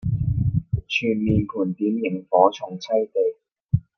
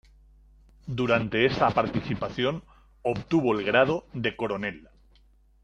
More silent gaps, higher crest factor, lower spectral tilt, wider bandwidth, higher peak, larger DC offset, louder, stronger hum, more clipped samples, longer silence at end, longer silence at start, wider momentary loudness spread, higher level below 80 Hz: first, 3.52-3.56 s vs none; about the same, 20 dB vs 22 dB; about the same, -7.5 dB/octave vs -7 dB/octave; second, 6.6 kHz vs 9.6 kHz; first, -2 dBFS vs -6 dBFS; neither; first, -23 LUFS vs -26 LUFS; neither; neither; second, 0.15 s vs 0.85 s; second, 0 s vs 0.85 s; second, 8 LU vs 11 LU; first, -40 dBFS vs -54 dBFS